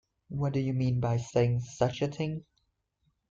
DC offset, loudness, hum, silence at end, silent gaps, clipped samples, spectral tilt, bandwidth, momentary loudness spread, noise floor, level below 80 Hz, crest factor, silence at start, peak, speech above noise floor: under 0.1%; -30 LUFS; none; 0.9 s; none; under 0.1%; -7.5 dB/octave; 7.6 kHz; 8 LU; -77 dBFS; -58 dBFS; 20 dB; 0.3 s; -12 dBFS; 47 dB